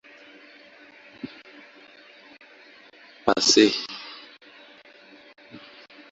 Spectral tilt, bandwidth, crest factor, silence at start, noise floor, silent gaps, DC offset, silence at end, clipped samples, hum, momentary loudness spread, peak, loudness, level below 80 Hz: -2 dB/octave; 8 kHz; 28 dB; 1.25 s; -51 dBFS; none; under 0.1%; 0.55 s; under 0.1%; none; 30 LU; -2 dBFS; -20 LUFS; -66 dBFS